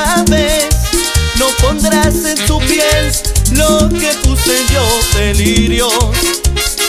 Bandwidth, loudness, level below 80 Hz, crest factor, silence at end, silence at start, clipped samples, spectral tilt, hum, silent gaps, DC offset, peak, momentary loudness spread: 16 kHz; -11 LUFS; -16 dBFS; 10 dB; 0 s; 0 s; under 0.1%; -3.5 dB/octave; none; none; under 0.1%; 0 dBFS; 2 LU